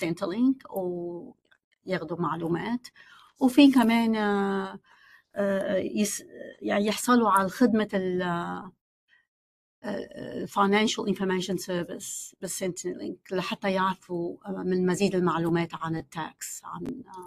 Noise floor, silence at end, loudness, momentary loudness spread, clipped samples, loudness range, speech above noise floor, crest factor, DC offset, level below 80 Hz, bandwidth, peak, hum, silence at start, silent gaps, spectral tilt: under -90 dBFS; 0 s; -27 LUFS; 14 LU; under 0.1%; 6 LU; over 63 dB; 20 dB; under 0.1%; -66 dBFS; 15 kHz; -6 dBFS; none; 0 s; 1.64-1.71 s, 8.81-9.08 s, 9.28-9.82 s; -5 dB/octave